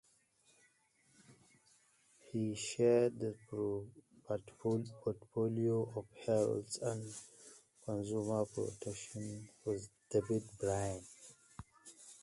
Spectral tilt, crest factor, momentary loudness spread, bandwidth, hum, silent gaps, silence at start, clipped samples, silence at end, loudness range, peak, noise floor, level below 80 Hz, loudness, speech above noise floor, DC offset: -6 dB/octave; 20 dB; 21 LU; 11.5 kHz; none; none; 1.3 s; under 0.1%; 0.05 s; 4 LU; -20 dBFS; -73 dBFS; -68 dBFS; -39 LUFS; 35 dB; under 0.1%